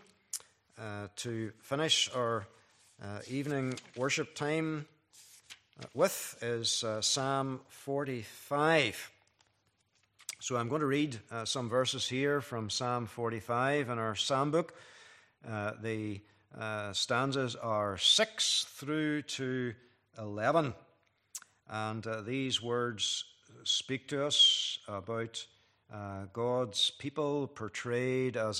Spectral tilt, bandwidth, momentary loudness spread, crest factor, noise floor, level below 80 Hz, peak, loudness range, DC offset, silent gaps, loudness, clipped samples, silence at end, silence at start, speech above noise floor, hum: -3 dB/octave; 15 kHz; 16 LU; 22 dB; -75 dBFS; -76 dBFS; -12 dBFS; 5 LU; under 0.1%; none; -33 LUFS; under 0.1%; 0 s; 0.35 s; 41 dB; none